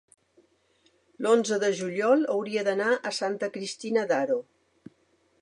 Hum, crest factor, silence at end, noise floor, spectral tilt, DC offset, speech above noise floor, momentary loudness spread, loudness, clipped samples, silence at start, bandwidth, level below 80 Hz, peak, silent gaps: none; 18 dB; 1 s; -67 dBFS; -4 dB/octave; under 0.1%; 41 dB; 8 LU; -27 LUFS; under 0.1%; 1.2 s; 11 kHz; -80 dBFS; -10 dBFS; none